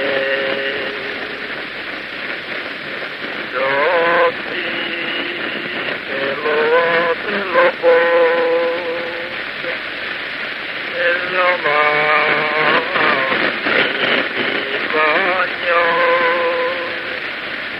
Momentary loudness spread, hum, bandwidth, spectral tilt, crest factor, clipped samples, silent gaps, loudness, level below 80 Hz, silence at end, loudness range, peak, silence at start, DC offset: 10 LU; none; 5.8 kHz; -5 dB/octave; 18 dB; under 0.1%; none; -17 LUFS; -58 dBFS; 0 s; 5 LU; 0 dBFS; 0 s; under 0.1%